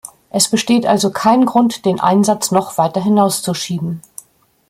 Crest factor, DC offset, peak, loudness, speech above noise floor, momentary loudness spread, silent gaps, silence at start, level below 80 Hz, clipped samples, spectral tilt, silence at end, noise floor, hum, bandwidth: 14 dB; under 0.1%; 0 dBFS; -15 LUFS; 37 dB; 9 LU; none; 0.05 s; -58 dBFS; under 0.1%; -4.5 dB/octave; 0.7 s; -52 dBFS; none; 16 kHz